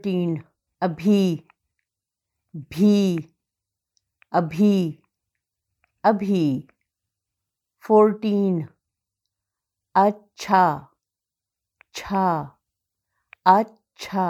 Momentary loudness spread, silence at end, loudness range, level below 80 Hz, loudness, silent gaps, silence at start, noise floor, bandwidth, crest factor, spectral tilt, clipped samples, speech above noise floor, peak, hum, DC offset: 17 LU; 0 s; 3 LU; -64 dBFS; -21 LUFS; none; 0.05 s; -87 dBFS; 14 kHz; 22 dB; -7 dB/octave; under 0.1%; 67 dB; -2 dBFS; none; under 0.1%